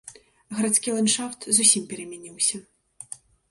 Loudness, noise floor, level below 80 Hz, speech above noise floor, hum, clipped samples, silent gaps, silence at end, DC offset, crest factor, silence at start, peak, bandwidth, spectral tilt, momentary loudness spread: -21 LUFS; -44 dBFS; -70 dBFS; 20 dB; none; under 0.1%; none; 0.35 s; under 0.1%; 24 dB; 0.05 s; -2 dBFS; 12 kHz; -2 dB/octave; 23 LU